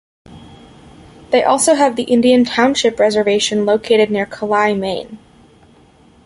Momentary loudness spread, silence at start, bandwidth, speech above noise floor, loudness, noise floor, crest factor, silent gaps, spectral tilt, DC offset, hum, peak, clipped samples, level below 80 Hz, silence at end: 8 LU; 0.3 s; 11.5 kHz; 34 dB; -14 LUFS; -48 dBFS; 16 dB; none; -3.5 dB/octave; under 0.1%; none; 0 dBFS; under 0.1%; -52 dBFS; 1.1 s